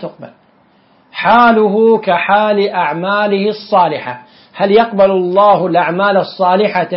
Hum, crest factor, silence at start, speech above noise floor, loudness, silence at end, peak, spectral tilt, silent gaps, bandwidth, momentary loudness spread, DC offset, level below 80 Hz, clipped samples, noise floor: none; 12 dB; 0 s; 39 dB; -12 LUFS; 0 s; 0 dBFS; -9 dB/octave; none; 5.8 kHz; 8 LU; under 0.1%; -56 dBFS; under 0.1%; -50 dBFS